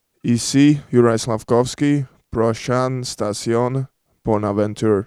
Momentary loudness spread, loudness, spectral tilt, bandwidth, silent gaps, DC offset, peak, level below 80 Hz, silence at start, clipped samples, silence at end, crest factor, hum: 9 LU; -19 LUFS; -6 dB/octave; 14 kHz; none; under 0.1%; -2 dBFS; -48 dBFS; 0.25 s; under 0.1%; 0 s; 16 dB; none